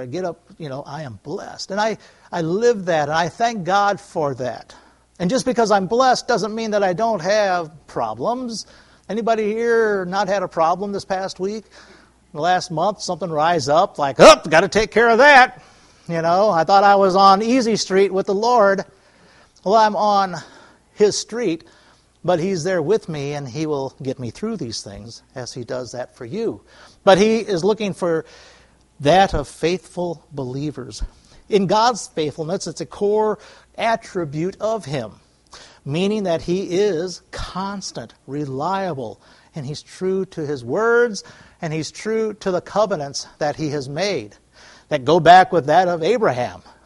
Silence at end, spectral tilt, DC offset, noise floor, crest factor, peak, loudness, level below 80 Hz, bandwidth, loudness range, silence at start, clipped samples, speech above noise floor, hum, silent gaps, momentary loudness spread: 0.25 s; -4.5 dB/octave; under 0.1%; -53 dBFS; 20 dB; 0 dBFS; -19 LUFS; -46 dBFS; 11.5 kHz; 10 LU; 0 s; under 0.1%; 35 dB; none; none; 17 LU